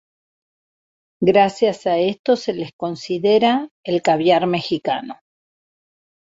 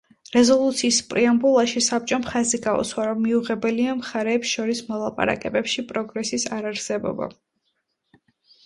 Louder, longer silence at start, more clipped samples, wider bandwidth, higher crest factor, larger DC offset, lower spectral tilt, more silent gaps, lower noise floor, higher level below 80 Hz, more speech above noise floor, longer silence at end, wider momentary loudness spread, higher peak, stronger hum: first, -19 LUFS vs -22 LUFS; first, 1.2 s vs 0.3 s; neither; second, 8 kHz vs 11.5 kHz; about the same, 18 dB vs 18 dB; neither; first, -6 dB/octave vs -3 dB/octave; first, 2.19-2.24 s, 2.73-2.79 s, 3.71-3.83 s vs none; first, under -90 dBFS vs -74 dBFS; second, -64 dBFS vs -58 dBFS; first, over 72 dB vs 52 dB; second, 1.1 s vs 1.35 s; about the same, 11 LU vs 9 LU; about the same, -2 dBFS vs -4 dBFS; neither